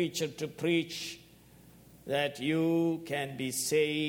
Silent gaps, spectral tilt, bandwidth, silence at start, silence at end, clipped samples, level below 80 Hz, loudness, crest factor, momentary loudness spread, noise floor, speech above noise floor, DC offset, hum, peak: none; -4 dB/octave; 17 kHz; 0 s; 0 s; under 0.1%; -70 dBFS; -32 LUFS; 16 dB; 10 LU; -57 dBFS; 26 dB; under 0.1%; none; -16 dBFS